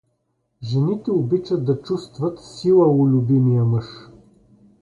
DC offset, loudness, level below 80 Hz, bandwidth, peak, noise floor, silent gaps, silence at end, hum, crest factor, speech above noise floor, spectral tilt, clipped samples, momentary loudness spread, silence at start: under 0.1%; -19 LUFS; -56 dBFS; 9.2 kHz; -6 dBFS; -70 dBFS; none; 0.75 s; none; 14 dB; 52 dB; -9.5 dB/octave; under 0.1%; 11 LU; 0.6 s